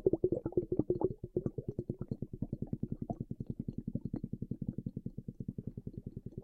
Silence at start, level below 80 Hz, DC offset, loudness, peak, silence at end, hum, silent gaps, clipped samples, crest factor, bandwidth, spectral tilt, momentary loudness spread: 0 s; -54 dBFS; under 0.1%; -40 LUFS; -16 dBFS; 0 s; none; none; under 0.1%; 24 dB; 4.5 kHz; -13 dB/octave; 11 LU